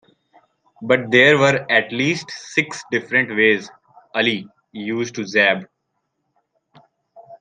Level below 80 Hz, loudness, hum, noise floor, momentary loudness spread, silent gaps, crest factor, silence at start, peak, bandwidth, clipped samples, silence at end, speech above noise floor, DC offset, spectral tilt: -66 dBFS; -18 LUFS; none; -74 dBFS; 14 LU; none; 20 dB; 0.8 s; -2 dBFS; 9.6 kHz; under 0.1%; 0.05 s; 55 dB; under 0.1%; -4.5 dB/octave